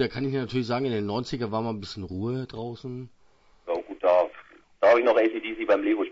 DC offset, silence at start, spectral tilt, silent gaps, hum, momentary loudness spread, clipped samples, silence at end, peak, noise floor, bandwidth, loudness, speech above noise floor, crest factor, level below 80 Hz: under 0.1%; 0 s; -7 dB/octave; none; none; 15 LU; under 0.1%; 0 s; -8 dBFS; -60 dBFS; 7.8 kHz; -26 LUFS; 33 dB; 18 dB; -58 dBFS